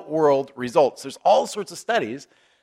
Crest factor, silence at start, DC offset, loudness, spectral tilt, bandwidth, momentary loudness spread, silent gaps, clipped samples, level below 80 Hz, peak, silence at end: 18 dB; 0 s; under 0.1%; -22 LUFS; -4.5 dB/octave; 15 kHz; 11 LU; none; under 0.1%; -70 dBFS; -4 dBFS; 0.4 s